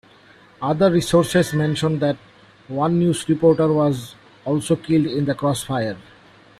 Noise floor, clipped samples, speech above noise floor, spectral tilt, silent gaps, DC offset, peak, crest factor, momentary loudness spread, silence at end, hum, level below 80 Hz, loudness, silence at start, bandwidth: -49 dBFS; under 0.1%; 31 dB; -6.5 dB/octave; none; under 0.1%; -4 dBFS; 16 dB; 12 LU; 0.6 s; none; -52 dBFS; -20 LUFS; 0.6 s; 15 kHz